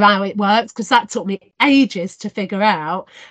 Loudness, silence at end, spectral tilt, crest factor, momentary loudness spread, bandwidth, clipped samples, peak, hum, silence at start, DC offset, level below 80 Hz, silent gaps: -17 LUFS; 0.05 s; -4.5 dB/octave; 16 dB; 12 LU; 9 kHz; under 0.1%; 0 dBFS; none; 0 s; under 0.1%; -64 dBFS; none